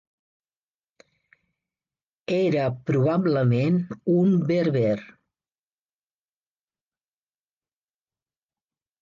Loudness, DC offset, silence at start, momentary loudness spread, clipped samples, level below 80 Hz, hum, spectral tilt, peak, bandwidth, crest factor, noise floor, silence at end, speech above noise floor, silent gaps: -23 LUFS; under 0.1%; 2.3 s; 5 LU; under 0.1%; -66 dBFS; none; -9 dB/octave; -12 dBFS; 7.2 kHz; 16 dB; under -90 dBFS; 3.95 s; over 68 dB; none